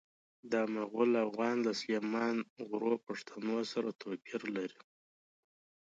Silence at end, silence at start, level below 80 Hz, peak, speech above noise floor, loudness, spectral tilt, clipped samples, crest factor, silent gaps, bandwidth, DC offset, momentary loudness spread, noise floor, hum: 1.2 s; 0.45 s; -86 dBFS; -18 dBFS; over 55 dB; -36 LUFS; -5 dB/octave; under 0.1%; 20 dB; 2.50-2.56 s; 7.8 kHz; under 0.1%; 9 LU; under -90 dBFS; none